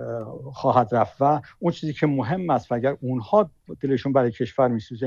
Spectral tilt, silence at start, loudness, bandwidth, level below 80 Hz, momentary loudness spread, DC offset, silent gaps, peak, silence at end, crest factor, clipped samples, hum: -8.5 dB/octave; 0 s; -23 LUFS; 7.4 kHz; -58 dBFS; 8 LU; under 0.1%; none; -6 dBFS; 0 s; 18 dB; under 0.1%; none